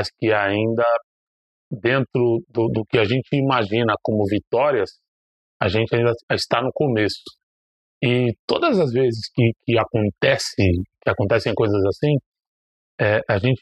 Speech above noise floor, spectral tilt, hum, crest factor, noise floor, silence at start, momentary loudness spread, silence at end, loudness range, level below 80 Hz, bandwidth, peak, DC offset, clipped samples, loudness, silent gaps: over 70 dB; -6.5 dB/octave; none; 20 dB; under -90 dBFS; 0 s; 5 LU; 0.05 s; 2 LU; -44 dBFS; 12.5 kHz; 0 dBFS; under 0.1%; under 0.1%; -20 LUFS; 1.04-1.71 s, 4.47-4.51 s, 5.08-5.60 s, 6.23-6.28 s, 7.43-8.01 s, 8.39-8.48 s, 12.26-12.32 s, 12.47-12.98 s